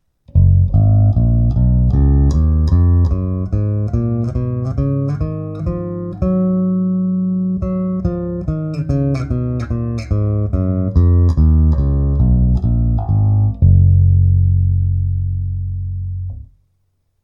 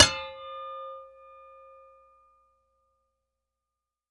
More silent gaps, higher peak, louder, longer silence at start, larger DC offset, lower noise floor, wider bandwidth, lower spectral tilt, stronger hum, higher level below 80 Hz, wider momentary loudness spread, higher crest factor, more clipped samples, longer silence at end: neither; about the same, -2 dBFS vs -2 dBFS; first, -16 LUFS vs -29 LUFS; first, 0.35 s vs 0 s; neither; second, -64 dBFS vs -88 dBFS; second, 5.6 kHz vs 10 kHz; first, -11 dB/octave vs -1 dB/octave; neither; first, -20 dBFS vs -58 dBFS; second, 9 LU vs 19 LU; second, 14 dB vs 30 dB; neither; second, 0.8 s vs 3.05 s